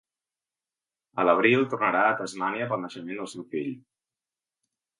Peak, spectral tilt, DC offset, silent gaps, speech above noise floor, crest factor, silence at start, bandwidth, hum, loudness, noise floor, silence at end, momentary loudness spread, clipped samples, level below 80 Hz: -6 dBFS; -5.5 dB/octave; under 0.1%; none; over 64 dB; 22 dB; 1.15 s; 11.5 kHz; none; -26 LUFS; under -90 dBFS; 1.2 s; 15 LU; under 0.1%; -78 dBFS